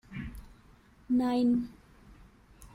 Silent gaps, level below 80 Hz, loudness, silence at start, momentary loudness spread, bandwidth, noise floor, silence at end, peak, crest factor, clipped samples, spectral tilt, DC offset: none; -54 dBFS; -30 LUFS; 0.1 s; 18 LU; 11.5 kHz; -59 dBFS; 0.1 s; -18 dBFS; 14 dB; under 0.1%; -7 dB/octave; under 0.1%